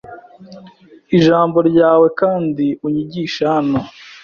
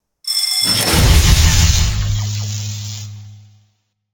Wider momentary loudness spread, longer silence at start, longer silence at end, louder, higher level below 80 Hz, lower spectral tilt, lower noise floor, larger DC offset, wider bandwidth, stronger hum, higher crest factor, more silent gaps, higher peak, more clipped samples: second, 9 LU vs 15 LU; second, 0.05 s vs 0.25 s; second, 0.1 s vs 0.75 s; about the same, -15 LUFS vs -14 LUFS; second, -54 dBFS vs -20 dBFS; first, -7.5 dB/octave vs -3 dB/octave; second, -43 dBFS vs -63 dBFS; neither; second, 7 kHz vs 19.5 kHz; neither; about the same, 14 dB vs 14 dB; neither; about the same, -2 dBFS vs 0 dBFS; neither